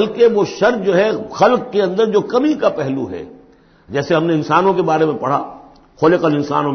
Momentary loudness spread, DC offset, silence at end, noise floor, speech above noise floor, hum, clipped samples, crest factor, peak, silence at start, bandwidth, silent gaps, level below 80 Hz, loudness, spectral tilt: 10 LU; under 0.1%; 0 s; -47 dBFS; 32 dB; none; under 0.1%; 14 dB; 0 dBFS; 0 s; 6.6 kHz; none; -54 dBFS; -16 LUFS; -6.5 dB/octave